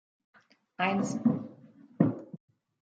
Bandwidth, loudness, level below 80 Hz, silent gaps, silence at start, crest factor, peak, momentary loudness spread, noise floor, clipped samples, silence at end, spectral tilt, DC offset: 9.2 kHz; -30 LUFS; -74 dBFS; none; 0.8 s; 24 dB; -8 dBFS; 19 LU; -55 dBFS; under 0.1%; 0.45 s; -6.5 dB/octave; under 0.1%